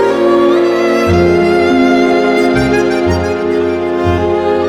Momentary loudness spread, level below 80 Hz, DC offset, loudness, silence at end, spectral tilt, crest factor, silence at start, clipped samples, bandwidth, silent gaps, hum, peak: 4 LU; -32 dBFS; under 0.1%; -11 LUFS; 0 s; -6.5 dB/octave; 10 dB; 0 s; under 0.1%; 12 kHz; none; none; 0 dBFS